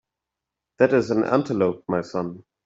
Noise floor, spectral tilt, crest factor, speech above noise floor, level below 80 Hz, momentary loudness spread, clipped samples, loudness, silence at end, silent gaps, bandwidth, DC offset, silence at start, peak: -86 dBFS; -7.5 dB/octave; 20 dB; 64 dB; -62 dBFS; 10 LU; under 0.1%; -22 LUFS; 0.25 s; none; 7.8 kHz; under 0.1%; 0.8 s; -4 dBFS